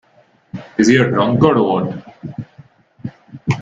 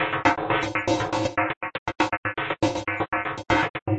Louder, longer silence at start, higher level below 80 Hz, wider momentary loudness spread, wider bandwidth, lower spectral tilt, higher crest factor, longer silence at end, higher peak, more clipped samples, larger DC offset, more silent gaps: first, -15 LUFS vs -25 LUFS; first, 0.55 s vs 0 s; about the same, -50 dBFS vs -50 dBFS; first, 20 LU vs 5 LU; about the same, 8 kHz vs 8.6 kHz; first, -6.5 dB/octave vs -5 dB/octave; about the same, 18 dB vs 22 dB; about the same, 0 s vs 0 s; first, 0 dBFS vs -4 dBFS; neither; neither; second, none vs 1.57-1.61 s, 1.78-1.86 s, 2.17-2.23 s, 3.70-3.74 s, 3.82-3.86 s